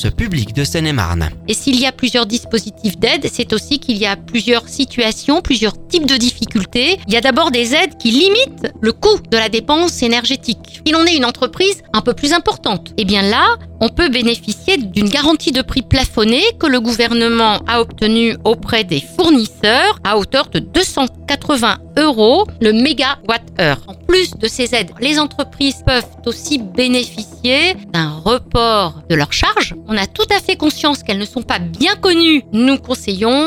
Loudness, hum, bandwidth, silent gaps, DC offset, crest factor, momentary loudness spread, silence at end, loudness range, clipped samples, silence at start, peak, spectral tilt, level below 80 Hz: -14 LUFS; none; 16.5 kHz; none; under 0.1%; 14 dB; 7 LU; 0 s; 3 LU; under 0.1%; 0 s; 0 dBFS; -4 dB/octave; -34 dBFS